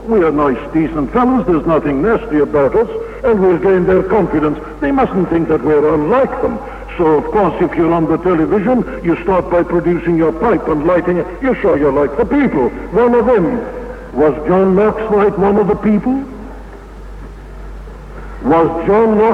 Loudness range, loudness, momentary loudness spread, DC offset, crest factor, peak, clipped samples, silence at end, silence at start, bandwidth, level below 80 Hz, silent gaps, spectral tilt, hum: 2 LU; -13 LUFS; 16 LU; under 0.1%; 12 dB; -2 dBFS; under 0.1%; 0 s; 0 s; 7.8 kHz; -32 dBFS; none; -9 dB/octave; none